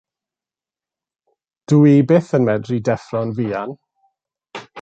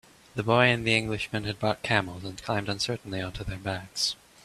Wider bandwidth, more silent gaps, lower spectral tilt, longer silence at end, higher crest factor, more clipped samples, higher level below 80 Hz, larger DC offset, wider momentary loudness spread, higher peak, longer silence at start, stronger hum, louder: second, 8 kHz vs 14 kHz; neither; first, -8.5 dB/octave vs -4.5 dB/octave; second, 0 s vs 0.3 s; second, 16 dB vs 24 dB; neither; second, -60 dBFS vs -52 dBFS; neither; first, 21 LU vs 13 LU; about the same, -2 dBFS vs -4 dBFS; first, 1.7 s vs 0.35 s; neither; first, -17 LUFS vs -27 LUFS